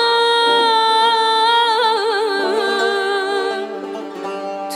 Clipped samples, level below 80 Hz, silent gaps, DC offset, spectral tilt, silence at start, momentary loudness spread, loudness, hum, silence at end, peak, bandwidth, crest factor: under 0.1%; -74 dBFS; none; under 0.1%; -1.5 dB/octave; 0 s; 13 LU; -16 LUFS; none; 0 s; -4 dBFS; 15.5 kHz; 12 dB